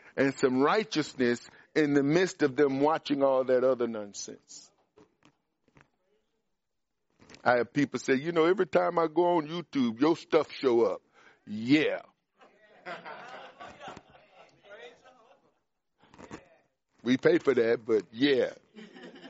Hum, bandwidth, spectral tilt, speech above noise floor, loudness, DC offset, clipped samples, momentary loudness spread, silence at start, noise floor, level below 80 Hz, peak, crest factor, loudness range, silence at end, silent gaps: none; 8 kHz; -4 dB/octave; 58 dB; -27 LUFS; under 0.1%; under 0.1%; 21 LU; 0.15 s; -85 dBFS; -74 dBFS; -8 dBFS; 22 dB; 19 LU; 0 s; none